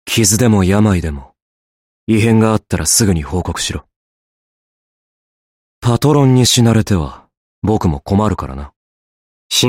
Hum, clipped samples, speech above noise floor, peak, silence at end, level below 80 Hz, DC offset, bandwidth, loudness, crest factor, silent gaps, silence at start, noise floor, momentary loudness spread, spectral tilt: none; under 0.1%; over 77 dB; 0 dBFS; 0 s; -34 dBFS; under 0.1%; 16.5 kHz; -13 LUFS; 14 dB; 1.42-2.07 s, 3.96-5.82 s, 7.37-7.62 s, 8.76-9.50 s; 0.05 s; under -90 dBFS; 15 LU; -4.5 dB/octave